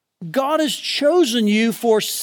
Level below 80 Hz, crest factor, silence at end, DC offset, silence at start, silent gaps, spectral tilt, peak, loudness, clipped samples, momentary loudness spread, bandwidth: -86 dBFS; 12 dB; 0 s; under 0.1%; 0.2 s; none; -3.5 dB/octave; -6 dBFS; -18 LUFS; under 0.1%; 5 LU; 19 kHz